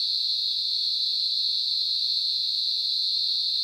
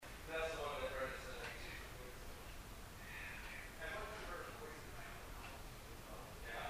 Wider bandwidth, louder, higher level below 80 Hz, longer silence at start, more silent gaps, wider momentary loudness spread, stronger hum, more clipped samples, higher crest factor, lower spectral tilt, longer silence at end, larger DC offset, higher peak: about the same, 17 kHz vs 15.5 kHz; first, -23 LUFS vs -49 LUFS; second, -72 dBFS vs -56 dBFS; about the same, 0 s vs 0 s; neither; second, 1 LU vs 10 LU; neither; neither; second, 12 dB vs 18 dB; second, 2.5 dB/octave vs -3.5 dB/octave; about the same, 0 s vs 0 s; neither; first, -14 dBFS vs -30 dBFS